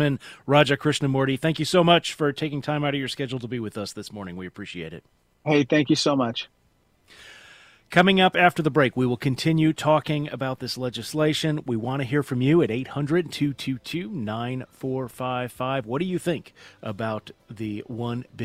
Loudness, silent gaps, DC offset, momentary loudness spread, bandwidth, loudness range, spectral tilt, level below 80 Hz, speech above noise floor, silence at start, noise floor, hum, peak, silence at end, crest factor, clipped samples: -24 LUFS; none; under 0.1%; 15 LU; 15.5 kHz; 8 LU; -5.5 dB/octave; -58 dBFS; 40 dB; 0 s; -64 dBFS; none; -2 dBFS; 0 s; 24 dB; under 0.1%